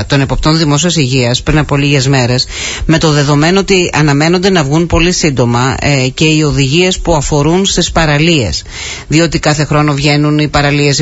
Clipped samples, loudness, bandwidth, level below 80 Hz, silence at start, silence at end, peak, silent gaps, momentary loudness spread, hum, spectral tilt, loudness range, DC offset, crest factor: 0.1%; -10 LUFS; 8 kHz; -24 dBFS; 0 s; 0 s; 0 dBFS; none; 3 LU; none; -4.5 dB/octave; 1 LU; under 0.1%; 10 dB